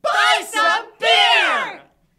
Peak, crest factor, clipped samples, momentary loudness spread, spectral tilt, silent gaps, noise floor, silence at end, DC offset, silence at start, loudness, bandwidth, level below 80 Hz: -2 dBFS; 16 dB; under 0.1%; 8 LU; 1 dB/octave; none; -39 dBFS; 0.4 s; under 0.1%; 0.05 s; -15 LUFS; 15.5 kHz; -68 dBFS